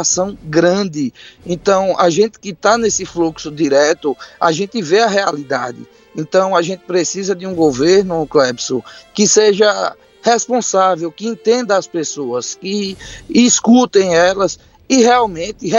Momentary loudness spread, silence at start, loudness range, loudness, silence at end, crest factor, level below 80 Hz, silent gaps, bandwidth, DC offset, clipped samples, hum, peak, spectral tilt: 12 LU; 0 s; 3 LU; -14 LUFS; 0 s; 14 dB; -50 dBFS; none; 8.2 kHz; under 0.1%; under 0.1%; none; 0 dBFS; -3.5 dB/octave